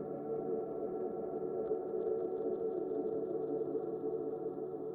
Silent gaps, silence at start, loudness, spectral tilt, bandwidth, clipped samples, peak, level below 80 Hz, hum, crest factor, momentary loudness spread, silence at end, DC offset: none; 0 s; -39 LUFS; -11.5 dB/octave; 2.2 kHz; under 0.1%; -26 dBFS; -74 dBFS; none; 12 dB; 3 LU; 0 s; under 0.1%